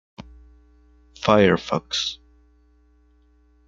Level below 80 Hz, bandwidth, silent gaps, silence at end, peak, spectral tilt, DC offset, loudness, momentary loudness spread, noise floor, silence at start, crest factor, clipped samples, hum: -52 dBFS; 7.6 kHz; none; 1.5 s; -2 dBFS; -5 dB/octave; under 0.1%; -21 LUFS; 20 LU; -58 dBFS; 0.2 s; 24 dB; under 0.1%; none